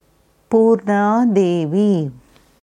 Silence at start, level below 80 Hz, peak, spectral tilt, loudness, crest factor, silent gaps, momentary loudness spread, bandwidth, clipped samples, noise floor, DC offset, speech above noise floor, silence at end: 0.5 s; -62 dBFS; -2 dBFS; -8 dB/octave; -16 LUFS; 14 dB; none; 5 LU; 9.6 kHz; under 0.1%; -57 dBFS; under 0.1%; 42 dB; 0.5 s